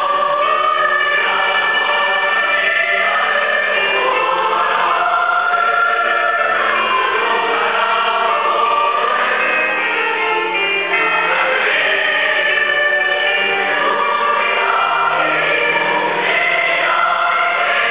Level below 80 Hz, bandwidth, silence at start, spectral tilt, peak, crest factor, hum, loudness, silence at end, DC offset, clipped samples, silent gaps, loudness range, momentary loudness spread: -66 dBFS; 4 kHz; 0 s; -5 dB/octave; -2 dBFS; 12 dB; none; -14 LUFS; 0 s; 0.4%; under 0.1%; none; 1 LU; 2 LU